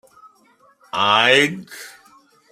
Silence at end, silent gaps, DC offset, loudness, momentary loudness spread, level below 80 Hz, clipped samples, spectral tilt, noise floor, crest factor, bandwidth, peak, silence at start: 0.6 s; none; under 0.1%; -16 LUFS; 24 LU; -68 dBFS; under 0.1%; -3 dB/octave; -56 dBFS; 20 dB; 16 kHz; -2 dBFS; 0.95 s